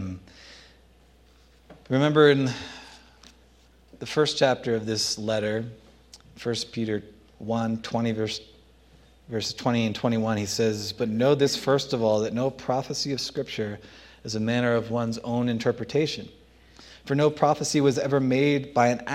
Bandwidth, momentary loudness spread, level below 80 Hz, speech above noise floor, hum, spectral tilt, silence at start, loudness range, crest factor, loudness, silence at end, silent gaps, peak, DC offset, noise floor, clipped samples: 15.5 kHz; 13 LU; -58 dBFS; 32 dB; none; -5 dB/octave; 0 s; 5 LU; 20 dB; -25 LUFS; 0 s; none; -6 dBFS; under 0.1%; -57 dBFS; under 0.1%